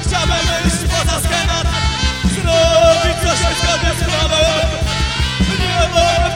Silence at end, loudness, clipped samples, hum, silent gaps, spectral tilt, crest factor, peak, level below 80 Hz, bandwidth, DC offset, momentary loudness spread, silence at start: 0 s; -14 LUFS; under 0.1%; none; none; -4 dB/octave; 14 dB; -2 dBFS; -20 dBFS; 16.5 kHz; under 0.1%; 5 LU; 0 s